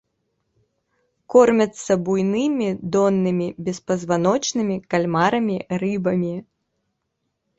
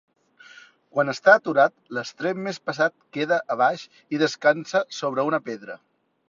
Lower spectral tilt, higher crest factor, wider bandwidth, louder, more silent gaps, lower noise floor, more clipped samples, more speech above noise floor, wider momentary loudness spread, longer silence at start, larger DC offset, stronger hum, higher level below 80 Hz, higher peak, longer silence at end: first, -6 dB/octave vs -4.5 dB/octave; about the same, 20 dB vs 22 dB; about the same, 8.2 kHz vs 7.6 kHz; first, -20 LUFS vs -23 LUFS; neither; first, -76 dBFS vs -50 dBFS; neither; first, 56 dB vs 27 dB; second, 8 LU vs 15 LU; first, 1.3 s vs 0.95 s; neither; neither; first, -60 dBFS vs -74 dBFS; about the same, -2 dBFS vs -2 dBFS; first, 1.15 s vs 0.55 s